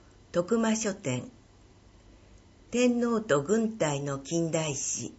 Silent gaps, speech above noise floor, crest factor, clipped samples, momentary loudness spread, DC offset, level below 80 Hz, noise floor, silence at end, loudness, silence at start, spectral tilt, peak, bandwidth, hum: none; 28 dB; 18 dB; under 0.1%; 8 LU; under 0.1%; -60 dBFS; -56 dBFS; 0.05 s; -29 LUFS; 0.35 s; -4.5 dB/octave; -12 dBFS; 8.2 kHz; none